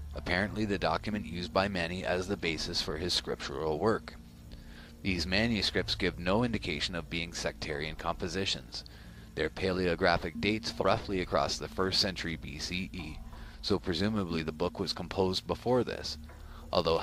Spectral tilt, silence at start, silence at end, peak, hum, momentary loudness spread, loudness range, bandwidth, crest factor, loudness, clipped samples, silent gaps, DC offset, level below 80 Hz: -4.5 dB/octave; 0 s; 0 s; -10 dBFS; none; 14 LU; 3 LU; 15.5 kHz; 24 dB; -32 LUFS; under 0.1%; none; under 0.1%; -48 dBFS